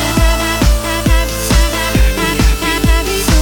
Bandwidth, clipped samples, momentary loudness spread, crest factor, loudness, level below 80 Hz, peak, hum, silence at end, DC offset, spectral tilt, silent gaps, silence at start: 19.5 kHz; under 0.1%; 1 LU; 10 dB; -13 LUFS; -14 dBFS; 0 dBFS; none; 0 s; under 0.1%; -4 dB/octave; none; 0 s